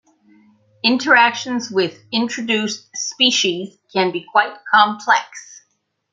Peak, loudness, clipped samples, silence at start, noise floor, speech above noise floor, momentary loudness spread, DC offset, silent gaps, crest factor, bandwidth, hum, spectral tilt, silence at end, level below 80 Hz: 0 dBFS; -17 LUFS; under 0.1%; 0.85 s; -68 dBFS; 50 dB; 12 LU; under 0.1%; none; 20 dB; 9.2 kHz; none; -2 dB/octave; 0.55 s; -72 dBFS